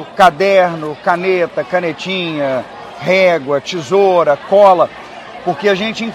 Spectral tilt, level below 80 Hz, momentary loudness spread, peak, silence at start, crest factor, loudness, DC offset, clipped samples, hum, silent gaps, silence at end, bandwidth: -5 dB/octave; -54 dBFS; 12 LU; 0 dBFS; 0 s; 14 dB; -13 LUFS; under 0.1%; 0.4%; none; none; 0 s; 13.5 kHz